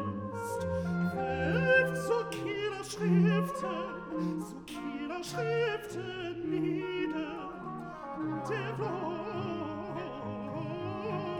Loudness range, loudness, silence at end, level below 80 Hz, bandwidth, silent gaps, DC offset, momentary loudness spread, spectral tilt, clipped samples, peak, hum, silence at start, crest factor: 7 LU; -34 LUFS; 0 s; -62 dBFS; 17 kHz; none; under 0.1%; 13 LU; -6.5 dB/octave; under 0.1%; -14 dBFS; none; 0 s; 18 dB